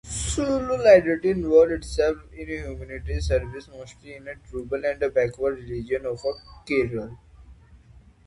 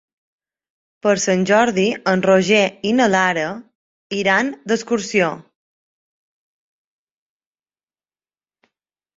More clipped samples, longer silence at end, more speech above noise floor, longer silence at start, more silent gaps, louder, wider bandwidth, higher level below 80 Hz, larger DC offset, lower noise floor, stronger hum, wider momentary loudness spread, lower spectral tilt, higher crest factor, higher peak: neither; second, 0.5 s vs 3.75 s; second, 28 dB vs over 73 dB; second, 0.05 s vs 1.05 s; second, none vs 3.75-4.10 s; second, -23 LUFS vs -17 LUFS; first, 11.5 kHz vs 7.8 kHz; first, -38 dBFS vs -62 dBFS; neither; second, -52 dBFS vs under -90 dBFS; neither; first, 22 LU vs 8 LU; about the same, -5.5 dB/octave vs -4.5 dB/octave; about the same, 22 dB vs 18 dB; about the same, -4 dBFS vs -2 dBFS